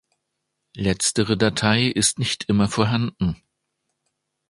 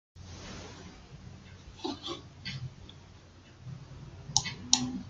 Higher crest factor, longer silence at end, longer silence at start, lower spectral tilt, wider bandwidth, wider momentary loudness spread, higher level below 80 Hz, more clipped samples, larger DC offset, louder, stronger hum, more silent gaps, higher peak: second, 20 dB vs 36 dB; first, 1.15 s vs 0 s; first, 0.75 s vs 0.15 s; first, -4 dB/octave vs -2 dB/octave; about the same, 11.5 kHz vs 11.5 kHz; second, 8 LU vs 23 LU; first, -46 dBFS vs -58 dBFS; neither; neither; first, -21 LUFS vs -34 LUFS; neither; neither; about the same, -2 dBFS vs -2 dBFS